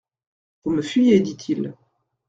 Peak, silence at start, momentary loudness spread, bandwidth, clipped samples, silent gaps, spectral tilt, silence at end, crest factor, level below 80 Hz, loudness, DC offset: -4 dBFS; 0.65 s; 14 LU; 7.8 kHz; under 0.1%; none; -6.5 dB/octave; 0.55 s; 18 dB; -62 dBFS; -21 LUFS; under 0.1%